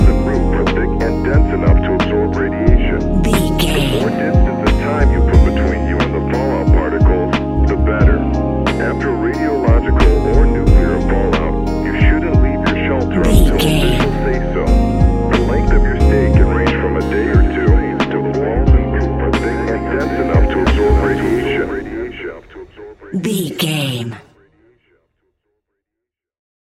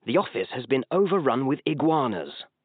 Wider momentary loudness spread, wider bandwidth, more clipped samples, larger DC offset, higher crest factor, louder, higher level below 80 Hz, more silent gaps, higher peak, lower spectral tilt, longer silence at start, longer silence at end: second, 5 LU vs 8 LU; first, 14 kHz vs 4.6 kHz; neither; neither; about the same, 14 dB vs 18 dB; first, -15 LUFS vs -25 LUFS; first, -16 dBFS vs -78 dBFS; neither; first, 0 dBFS vs -8 dBFS; first, -7 dB/octave vs -5 dB/octave; about the same, 0 s vs 0.05 s; first, 2.45 s vs 0.2 s